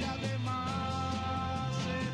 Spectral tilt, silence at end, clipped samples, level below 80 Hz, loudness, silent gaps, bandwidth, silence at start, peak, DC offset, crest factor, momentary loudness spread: -5.5 dB/octave; 0 s; under 0.1%; -52 dBFS; -34 LUFS; none; 12 kHz; 0 s; -22 dBFS; under 0.1%; 12 dB; 0 LU